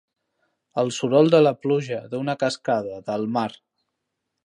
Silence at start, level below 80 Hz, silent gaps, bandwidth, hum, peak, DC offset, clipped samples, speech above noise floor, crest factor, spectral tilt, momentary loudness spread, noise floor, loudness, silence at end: 0.75 s; -70 dBFS; none; 11 kHz; none; -4 dBFS; under 0.1%; under 0.1%; 58 dB; 20 dB; -6 dB/octave; 12 LU; -80 dBFS; -22 LUFS; 0.9 s